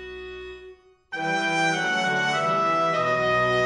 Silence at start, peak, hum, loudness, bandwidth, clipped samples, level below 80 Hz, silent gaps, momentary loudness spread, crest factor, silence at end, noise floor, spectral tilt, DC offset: 0 s; -12 dBFS; none; -23 LUFS; 11 kHz; under 0.1%; -56 dBFS; none; 16 LU; 12 dB; 0 s; -48 dBFS; -4 dB/octave; under 0.1%